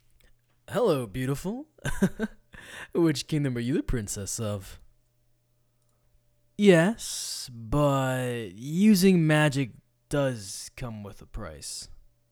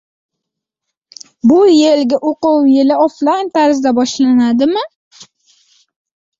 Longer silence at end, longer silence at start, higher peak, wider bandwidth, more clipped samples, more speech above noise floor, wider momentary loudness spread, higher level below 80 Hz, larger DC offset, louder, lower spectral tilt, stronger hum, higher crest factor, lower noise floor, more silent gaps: second, 0.4 s vs 1.15 s; second, 0.7 s vs 1.45 s; about the same, -4 dBFS vs -2 dBFS; first, 19 kHz vs 7.8 kHz; neither; second, 42 dB vs 68 dB; first, 18 LU vs 7 LU; first, -46 dBFS vs -58 dBFS; neither; second, -27 LUFS vs -12 LUFS; about the same, -5.5 dB/octave vs -4.5 dB/octave; neither; first, 22 dB vs 12 dB; second, -68 dBFS vs -79 dBFS; second, none vs 4.95-5.11 s